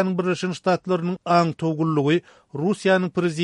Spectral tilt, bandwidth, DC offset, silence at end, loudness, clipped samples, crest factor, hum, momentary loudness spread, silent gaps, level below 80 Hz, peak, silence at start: -6.5 dB/octave; 11 kHz; under 0.1%; 0 s; -22 LUFS; under 0.1%; 18 dB; none; 5 LU; none; -66 dBFS; -4 dBFS; 0 s